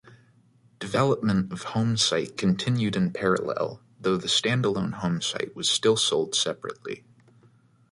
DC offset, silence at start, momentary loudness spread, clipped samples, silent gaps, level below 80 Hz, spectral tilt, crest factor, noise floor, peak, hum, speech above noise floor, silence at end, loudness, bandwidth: under 0.1%; 0.05 s; 10 LU; under 0.1%; none; -58 dBFS; -4 dB/octave; 18 dB; -60 dBFS; -8 dBFS; none; 35 dB; 0.95 s; -25 LUFS; 11.5 kHz